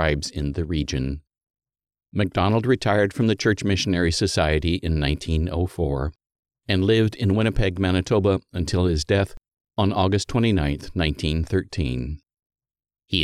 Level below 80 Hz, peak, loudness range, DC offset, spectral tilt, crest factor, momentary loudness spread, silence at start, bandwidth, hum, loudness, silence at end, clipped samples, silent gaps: -34 dBFS; -6 dBFS; 3 LU; under 0.1%; -6 dB/octave; 18 dB; 7 LU; 0 s; 13 kHz; none; -23 LUFS; 0 s; under 0.1%; 1.43-1.47 s, 6.39-6.43 s, 12.46-12.50 s